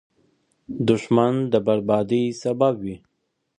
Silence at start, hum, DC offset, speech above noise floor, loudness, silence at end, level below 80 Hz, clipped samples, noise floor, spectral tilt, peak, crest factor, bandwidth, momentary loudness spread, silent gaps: 0.7 s; none; under 0.1%; 44 dB; -21 LUFS; 0.6 s; -60 dBFS; under 0.1%; -65 dBFS; -7.5 dB/octave; -4 dBFS; 18 dB; 10 kHz; 13 LU; none